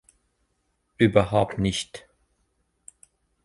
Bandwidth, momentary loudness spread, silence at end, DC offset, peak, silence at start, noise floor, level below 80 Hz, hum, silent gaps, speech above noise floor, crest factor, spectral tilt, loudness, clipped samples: 11.5 kHz; 17 LU; 1.45 s; under 0.1%; -4 dBFS; 1 s; -73 dBFS; -48 dBFS; none; none; 51 dB; 24 dB; -6 dB/octave; -23 LUFS; under 0.1%